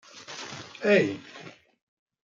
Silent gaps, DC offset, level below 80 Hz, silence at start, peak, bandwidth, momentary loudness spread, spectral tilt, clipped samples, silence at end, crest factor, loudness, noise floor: none; under 0.1%; -76 dBFS; 0.15 s; -8 dBFS; 7.6 kHz; 23 LU; -5 dB/octave; under 0.1%; 0.75 s; 22 dB; -26 LUFS; -48 dBFS